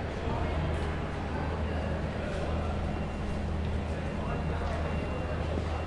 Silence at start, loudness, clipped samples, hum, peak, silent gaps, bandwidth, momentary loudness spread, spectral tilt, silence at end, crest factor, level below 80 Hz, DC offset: 0 s; -33 LUFS; under 0.1%; none; -18 dBFS; none; 10.5 kHz; 2 LU; -7.5 dB/octave; 0 s; 14 dB; -38 dBFS; under 0.1%